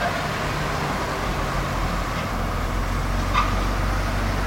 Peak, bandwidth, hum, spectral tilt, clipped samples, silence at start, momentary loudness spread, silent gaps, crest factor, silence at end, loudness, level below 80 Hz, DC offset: -8 dBFS; 16.5 kHz; none; -5 dB/octave; under 0.1%; 0 s; 4 LU; none; 16 dB; 0 s; -25 LUFS; -28 dBFS; under 0.1%